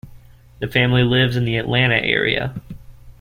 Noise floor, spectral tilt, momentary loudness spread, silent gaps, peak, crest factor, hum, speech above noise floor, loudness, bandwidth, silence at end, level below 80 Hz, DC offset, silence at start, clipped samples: -43 dBFS; -7 dB/octave; 12 LU; none; -2 dBFS; 18 dB; none; 26 dB; -17 LUFS; 15 kHz; 0.1 s; -42 dBFS; under 0.1%; 0.05 s; under 0.1%